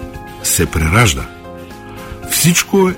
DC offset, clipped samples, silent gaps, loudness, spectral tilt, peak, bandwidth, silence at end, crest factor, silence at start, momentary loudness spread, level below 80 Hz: under 0.1%; under 0.1%; none; -13 LUFS; -4 dB/octave; 0 dBFS; 16.5 kHz; 0 s; 16 dB; 0 s; 21 LU; -28 dBFS